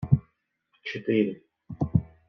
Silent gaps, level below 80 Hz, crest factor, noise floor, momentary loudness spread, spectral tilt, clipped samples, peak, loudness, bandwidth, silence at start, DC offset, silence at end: none; -48 dBFS; 22 dB; -72 dBFS; 17 LU; -9.5 dB/octave; under 0.1%; -6 dBFS; -28 LUFS; 6.2 kHz; 0 s; under 0.1%; 0.25 s